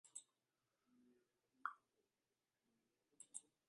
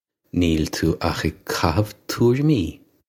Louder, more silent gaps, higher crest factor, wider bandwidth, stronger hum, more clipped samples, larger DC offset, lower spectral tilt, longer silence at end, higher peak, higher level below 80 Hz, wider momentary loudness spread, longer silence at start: second, -56 LUFS vs -22 LUFS; neither; first, 34 dB vs 20 dB; second, 11 kHz vs 17 kHz; neither; neither; neither; second, 1 dB/octave vs -6 dB/octave; about the same, 0.3 s vs 0.35 s; second, -30 dBFS vs -2 dBFS; second, under -90 dBFS vs -38 dBFS; first, 13 LU vs 8 LU; second, 0.05 s vs 0.35 s